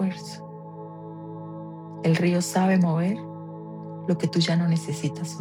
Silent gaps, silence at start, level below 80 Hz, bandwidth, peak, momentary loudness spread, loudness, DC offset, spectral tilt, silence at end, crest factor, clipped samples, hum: none; 0 s; -74 dBFS; 14 kHz; -10 dBFS; 18 LU; -24 LUFS; under 0.1%; -6 dB/octave; 0 s; 16 dB; under 0.1%; none